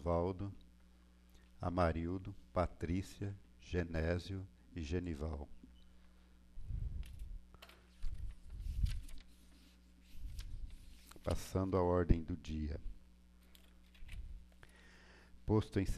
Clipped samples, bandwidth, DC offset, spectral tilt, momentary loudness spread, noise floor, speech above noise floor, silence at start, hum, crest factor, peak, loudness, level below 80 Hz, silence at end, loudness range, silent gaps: under 0.1%; 14 kHz; under 0.1%; -7.5 dB/octave; 25 LU; -64 dBFS; 26 dB; 0 s; none; 24 dB; -18 dBFS; -41 LUFS; -48 dBFS; 0 s; 9 LU; none